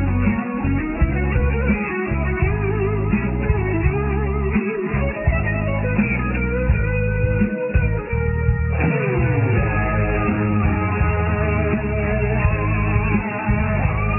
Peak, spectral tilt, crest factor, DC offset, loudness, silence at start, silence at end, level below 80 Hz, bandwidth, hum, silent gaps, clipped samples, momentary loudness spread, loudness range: -4 dBFS; -12 dB/octave; 14 dB; under 0.1%; -20 LUFS; 0 s; 0 s; -24 dBFS; 3 kHz; none; none; under 0.1%; 2 LU; 1 LU